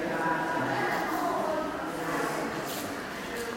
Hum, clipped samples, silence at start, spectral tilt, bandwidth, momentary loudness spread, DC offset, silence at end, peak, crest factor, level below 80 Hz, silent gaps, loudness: none; under 0.1%; 0 s; -4 dB/octave; 16.5 kHz; 6 LU; under 0.1%; 0 s; -16 dBFS; 16 dB; -60 dBFS; none; -31 LUFS